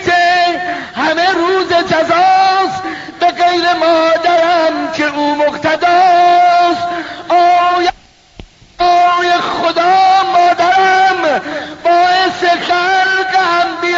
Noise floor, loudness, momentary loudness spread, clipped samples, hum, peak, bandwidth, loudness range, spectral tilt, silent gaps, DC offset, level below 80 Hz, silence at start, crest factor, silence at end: -38 dBFS; -11 LUFS; 7 LU; under 0.1%; none; 0 dBFS; 7.8 kHz; 2 LU; -0.5 dB/octave; none; under 0.1%; -48 dBFS; 0 s; 10 dB; 0 s